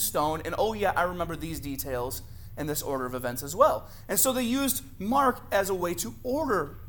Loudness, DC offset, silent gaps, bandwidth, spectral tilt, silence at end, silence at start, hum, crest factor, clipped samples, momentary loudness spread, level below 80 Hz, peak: -28 LUFS; under 0.1%; none; 19 kHz; -3.5 dB/octave; 0 s; 0 s; none; 22 dB; under 0.1%; 10 LU; -46 dBFS; -6 dBFS